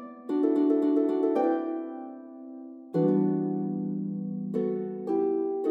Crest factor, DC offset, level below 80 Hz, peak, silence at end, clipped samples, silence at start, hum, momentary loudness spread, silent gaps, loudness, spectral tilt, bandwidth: 14 dB; under 0.1%; under -90 dBFS; -14 dBFS; 0 s; under 0.1%; 0 s; none; 18 LU; none; -28 LUFS; -10.5 dB/octave; 4.4 kHz